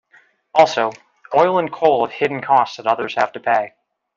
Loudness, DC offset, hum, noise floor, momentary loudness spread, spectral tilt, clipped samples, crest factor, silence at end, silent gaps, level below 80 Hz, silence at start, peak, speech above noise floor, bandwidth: -18 LUFS; under 0.1%; none; -54 dBFS; 6 LU; -5 dB/octave; under 0.1%; 18 dB; 0.5 s; none; -64 dBFS; 0.55 s; -2 dBFS; 37 dB; 7.6 kHz